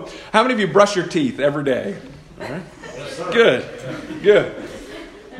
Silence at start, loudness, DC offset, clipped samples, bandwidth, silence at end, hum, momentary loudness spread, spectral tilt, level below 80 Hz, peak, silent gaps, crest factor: 0 s; -17 LUFS; under 0.1%; under 0.1%; 12 kHz; 0 s; none; 19 LU; -5 dB/octave; -52 dBFS; 0 dBFS; none; 20 dB